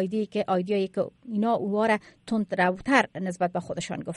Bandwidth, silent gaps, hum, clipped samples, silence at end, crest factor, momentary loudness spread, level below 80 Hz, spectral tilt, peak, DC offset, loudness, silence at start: 11.5 kHz; none; none; under 0.1%; 0 s; 20 dB; 8 LU; -62 dBFS; -6 dB/octave; -6 dBFS; under 0.1%; -27 LUFS; 0 s